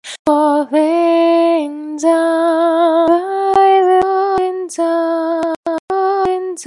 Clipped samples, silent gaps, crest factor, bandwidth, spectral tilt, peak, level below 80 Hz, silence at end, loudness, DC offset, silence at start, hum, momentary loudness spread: under 0.1%; 0.19-0.25 s, 5.56-5.63 s, 5.79-5.88 s; 12 dB; 11.5 kHz; -4 dB/octave; 0 dBFS; -56 dBFS; 0 s; -14 LUFS; under 0.1%; 0.05 s; none; 7 LU